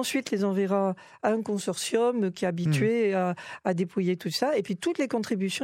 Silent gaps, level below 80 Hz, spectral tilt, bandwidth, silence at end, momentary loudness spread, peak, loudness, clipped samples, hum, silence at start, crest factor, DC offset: none; -74 dBFS; -5.5 dB/octave; 16 kHz; 0 s; 5 LU; -10 dBFS; -27 LUFS; under 0.1%; none; 0 s; 18 dB; under 0.1%